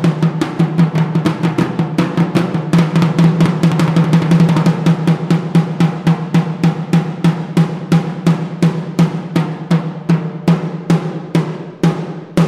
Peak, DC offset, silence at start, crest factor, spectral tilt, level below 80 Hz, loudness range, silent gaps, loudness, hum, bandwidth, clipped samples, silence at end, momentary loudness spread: 0 dBFS; under 0.1%; 0 s; 14 dB; -7.5 dB/octave; -50 dBFS; 4 LU; none; -15 LUFS; none; 11 kHz; under 0.1%; 0 s; 5 LU